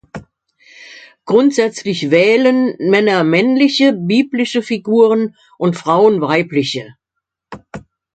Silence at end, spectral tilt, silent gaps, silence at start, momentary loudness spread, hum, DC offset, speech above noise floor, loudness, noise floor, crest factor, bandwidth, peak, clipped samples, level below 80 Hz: 0.35 s; -5.5 dB/octave; none; 0.15 s; 18 LU; none; under 0.1%; 65 dB; -14 LUFS; -78 dBFS; 14 dB; 9 kHz; 0 dBFS; under 0.1%; -58 dBFS